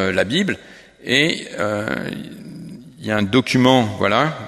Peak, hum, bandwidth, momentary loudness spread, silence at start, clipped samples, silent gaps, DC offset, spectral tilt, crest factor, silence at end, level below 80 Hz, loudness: 0 dBFS; none; 14 kHz; 20 LU; 0 s; under 0.1%; none; under 0.1%; -5 dB/octave; 18 dB; 0 s; -54 dBFS; -18 LUFS